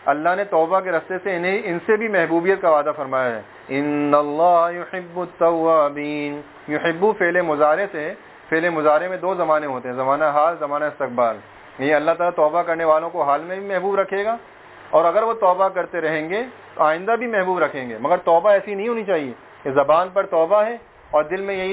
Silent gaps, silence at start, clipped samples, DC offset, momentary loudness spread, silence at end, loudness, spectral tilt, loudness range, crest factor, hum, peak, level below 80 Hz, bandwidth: none; 0 s; under 0.1%; under 0.1%; 9 LU; 0 s; -20 LUFS; -9.5 dB/octave; 1 LU; 20 dB; none; 0 dBFS; -62 dBFS; 4 kHz